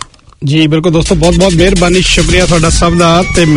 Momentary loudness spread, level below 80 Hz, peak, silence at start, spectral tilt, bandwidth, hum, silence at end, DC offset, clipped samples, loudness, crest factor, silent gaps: 3 LU; -18 dBFS; 0 dBFS; 0.4 s; -4.5 dB/octave; 11 kHz; none; 0 s; under 0.1%; 1%; -8 LUFS; 8 dB; none